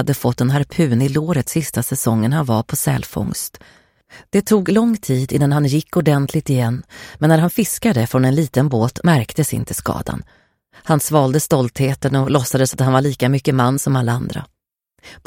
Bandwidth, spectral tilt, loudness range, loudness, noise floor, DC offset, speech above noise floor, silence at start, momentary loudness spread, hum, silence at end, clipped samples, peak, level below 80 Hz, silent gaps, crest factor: 17 kHz; -6 dB/octave; 2 LU; -17 LUFS; -66 dBFS; under 0.1%; 49 dB; 0 s; 7 LU; none; 0.1 s; under 0.1%; 0 dBFS; -46 dBFS; none; 16 dB